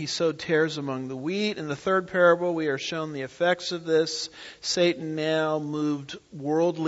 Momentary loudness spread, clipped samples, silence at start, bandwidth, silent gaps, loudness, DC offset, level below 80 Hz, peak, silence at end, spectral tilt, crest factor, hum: 11 LU; under 0.1%; 0 s; 8 kHz; none; -26 LUFS; under 0.1%; -68 dBFS; -8 dBFS; 0 s; -4.5 dB/octave; 18 dB; none